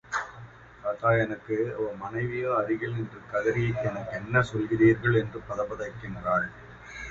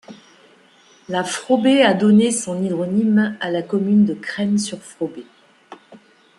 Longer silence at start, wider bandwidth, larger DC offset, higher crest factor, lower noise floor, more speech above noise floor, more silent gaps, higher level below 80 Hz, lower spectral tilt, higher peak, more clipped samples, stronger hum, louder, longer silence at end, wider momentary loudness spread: about the same, 0.05 s vs 0.1 s; second, 7.8 kHz vs 11.5 kHz; neither; about the same, 20 dB vs 18 dB; second, -47 dBFS vs -52 dBFS; second, 20 dB vs 34 dB; neither; first, -54 dBFS vs -66 dBFS; first, -7.5 dB/octave vs -5 dB/octave; second, -8 dBFS vs 0 dBFS; neither; neither; second, -28 LUFS vs -18 LUFS; second, 0 s vs 0.45 s; about the same, 13 LU vs 14 LU